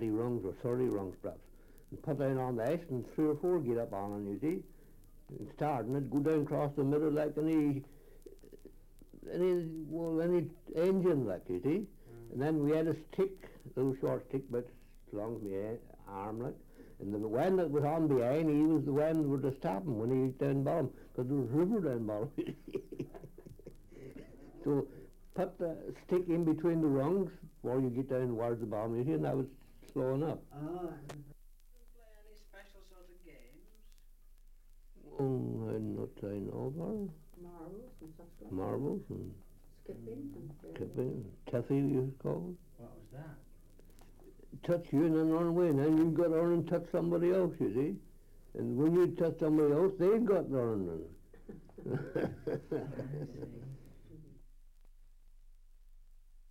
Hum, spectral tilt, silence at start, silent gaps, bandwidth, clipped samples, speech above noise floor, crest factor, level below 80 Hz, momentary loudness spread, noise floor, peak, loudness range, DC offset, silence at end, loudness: none; -9 dB/octave; 0 s; none; 16.5 kHz; under 0.1%; 24 dB; 16 dB; -58 dBFS; 20 LU; -58 dBFS; -20 dBFS; 10 LU; under 0.1%; 0 s; -35 LUFS